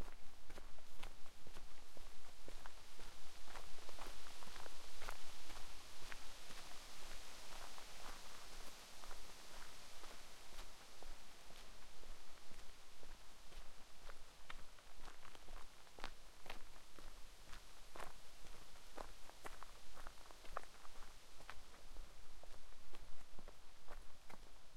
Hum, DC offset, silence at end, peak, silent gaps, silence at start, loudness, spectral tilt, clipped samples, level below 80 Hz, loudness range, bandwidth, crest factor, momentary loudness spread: none; under 0.1%; 0 s; -28 dBFS; none; 0 s; -58 LUFS; -2.5 dB/octave; under 0.1%; -58 dBFS; 6 LU; 15 kHz; 14 dB; 7 LU